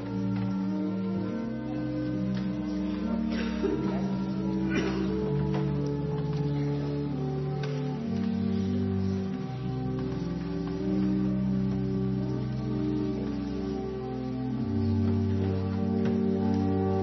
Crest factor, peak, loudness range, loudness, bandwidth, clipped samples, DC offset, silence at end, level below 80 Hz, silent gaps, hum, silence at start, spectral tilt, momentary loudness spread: 14 dB; -16 dBFS; 2 LU; -30 LUFS; 6.2 kHz; under 0.1%; under 0.1%; 0 s; -48 dBFS; none; none; 0 s; -9 dB/octave; 6 LU